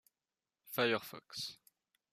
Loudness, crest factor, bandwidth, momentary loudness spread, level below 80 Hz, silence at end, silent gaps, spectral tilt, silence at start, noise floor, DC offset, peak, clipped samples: -38 LUFS; 22 dB; 15 kHz; 11 LU; -84 dBFS; 0.55 s; none; -3.5 dB/octave; 0.65 s; under -90 dBFS; under 0.1%; -20 dBFS; under 0.1%